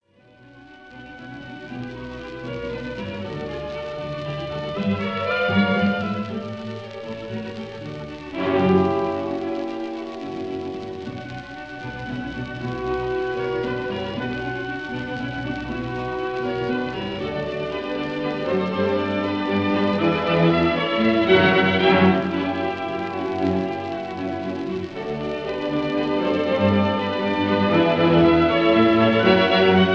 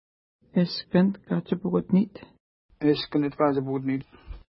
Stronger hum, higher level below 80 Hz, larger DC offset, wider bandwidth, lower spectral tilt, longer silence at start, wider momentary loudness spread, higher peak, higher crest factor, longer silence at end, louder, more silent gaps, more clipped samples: neither; first, -48 dBFS vs -54 dBFS; first, 0.1% vs under 0.1%; first, 7.4 kHz vs 5.8 kHz; second, -7.5 dB/octave vs -11.5 dB/octave; second, 0.4 s vs 0.55 s; first, 17 LU vs 7 LU; first, -2 dBFS vs -8 dBFS; about the same, 20 dB vs 18 dB; about the same, 0 s vs 0.1 s; first, -22 LUFS vs -26 LUFS; second, none vs 2.40-2.69 s; neither